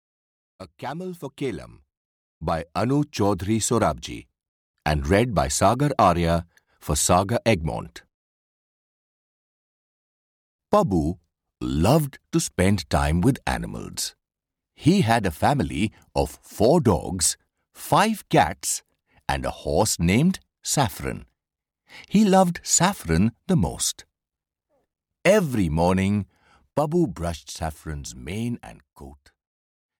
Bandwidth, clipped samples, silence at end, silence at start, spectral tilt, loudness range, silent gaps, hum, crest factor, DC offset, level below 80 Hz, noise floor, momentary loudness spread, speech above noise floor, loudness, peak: 19.5 kHz; under 0.1%; 0.85 s; 0.6 s; -5 dB/octave; 6 LU; 1.97-2.41 s, 4.48-4.74 s, 8.14-10.59 s; none; 18 dB; under 0.1%; -40 dBFS; -88 dBFS; 14 LU; 66 dB; -23 LUFS; -6 dBFS